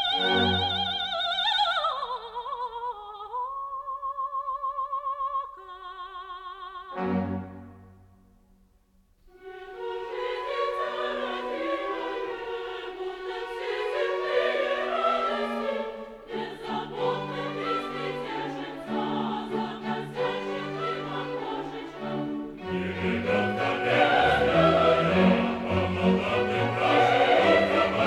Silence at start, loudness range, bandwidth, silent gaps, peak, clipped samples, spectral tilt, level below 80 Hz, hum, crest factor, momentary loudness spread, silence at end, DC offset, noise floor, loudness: 0 s; 12 LU; 12 kHz; none; -8 dBFS; under 0.1%; -6 dB/octave; -54 dBFS; none; 20 dB; 15 LU; 0 s; under 0.1%; -63 dBFS; -27 LUFS